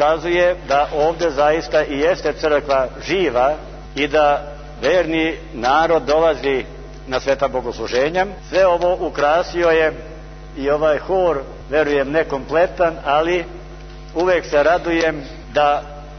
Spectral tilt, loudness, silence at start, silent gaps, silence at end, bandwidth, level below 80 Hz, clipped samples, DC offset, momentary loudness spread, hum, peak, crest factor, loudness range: -5 dB/octave; -18 LUFS; 0 s; none; 0 s; 6.6 kHz; -36 dBFS; under 0.1%; under 0.1%; 10 LU; none; -2 dBFS; 16 dB; 1 LU